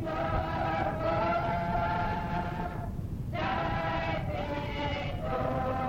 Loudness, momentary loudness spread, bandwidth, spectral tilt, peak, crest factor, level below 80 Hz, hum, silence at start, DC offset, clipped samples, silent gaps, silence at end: -32 LUFS; 6 LU; 16.5 kHz; -7.5 dB/octave; -18 dBFS; 14 dB; -42 dBFS; none; 0 s; under 0.1%; under 0.1%; none; 0 s